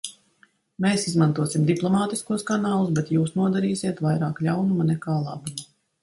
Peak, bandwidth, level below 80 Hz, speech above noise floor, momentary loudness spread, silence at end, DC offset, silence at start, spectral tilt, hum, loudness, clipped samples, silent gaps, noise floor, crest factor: -6 dBFS; 11.5 kHz; -62 dBFS; 39 dB; 6 LU; 0.4 s; under 0.1%; 0.05 s; -6 dB/octave; none; -24 LUFS; under 0.1%; none; -61 dBFS; 16 dB